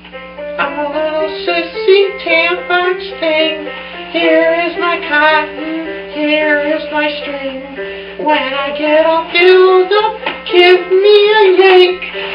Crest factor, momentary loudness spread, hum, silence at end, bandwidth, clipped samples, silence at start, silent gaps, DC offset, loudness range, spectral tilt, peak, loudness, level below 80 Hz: 12 dB; 15 LU; none; 0 s; 5.4 kHz; 0.1%; 0.05 s; none; under 0.1%; 6 LU; -5.5 dB/octave; 0 dBFS; -11 LUFS; -50 dBFS